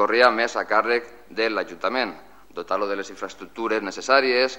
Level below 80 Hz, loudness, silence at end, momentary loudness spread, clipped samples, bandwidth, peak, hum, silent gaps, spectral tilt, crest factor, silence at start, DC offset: -64 dBFS; -22 LUFS; 0 s; 17 LU; under 0.1%; 16 kHz; -2 dBFS; none; none; -2.5 dB/octave; 20 dB; 0 s; 0.4%